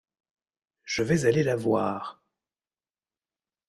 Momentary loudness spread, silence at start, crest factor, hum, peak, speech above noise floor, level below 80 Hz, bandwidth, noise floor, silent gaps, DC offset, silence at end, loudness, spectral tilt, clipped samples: 12 LU; 0.85 s; 20 dB; none; -10 dBFS; over 65 dB; -60 dBFS; 13 kHz; under -90 dBFS; none; under 0.1%; 1.55 s; -26 LUFS; -6 dB/octave; under 0.1%